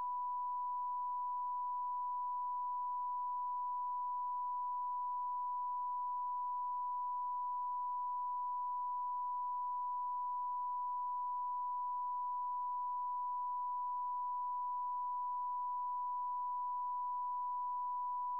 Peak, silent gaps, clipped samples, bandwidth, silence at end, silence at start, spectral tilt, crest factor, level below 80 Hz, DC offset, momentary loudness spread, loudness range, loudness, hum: -36 dBFS; none; under 0.1%; 1.1 kHz; 0 s; 0 s; -3 dB/octave; 4 dB; under -90 dBFS; 0.1%; 0 LU; 0 LU; -40 LUFS; none